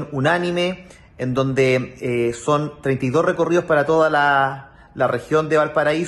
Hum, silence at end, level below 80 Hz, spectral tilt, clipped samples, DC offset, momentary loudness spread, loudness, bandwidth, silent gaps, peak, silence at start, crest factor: none; 0 s; -52 dBFS; -6 dB/octave; under 0.1%; under 0.1%; 8 LU; -19 LUFS; 12 kHz; none; -6 dBFS; 0 s; 14 dB